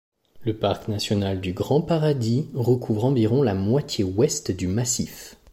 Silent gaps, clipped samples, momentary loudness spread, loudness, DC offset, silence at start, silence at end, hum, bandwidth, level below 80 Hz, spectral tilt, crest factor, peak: none; under 0.1%; 6 LU; -23 LUFS; under 0.1%; 0.35 s; 0.2 s; none; 16 kHz; -52 dBFS; -6 dB/octave; 16 dB; -8 dBFS